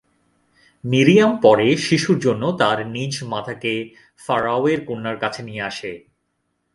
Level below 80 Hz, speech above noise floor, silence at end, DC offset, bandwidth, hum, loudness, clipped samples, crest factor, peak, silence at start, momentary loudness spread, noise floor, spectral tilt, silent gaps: -58 dBFS; 53 dB; 0.75 s; under 0.1%; 11.5 kHz; none; -19 LUFS; under 0.1%; 20 dB; 0 dBFS; 0.85 s; 15 LU; -72 dBFS; -5.5 dB/octave; none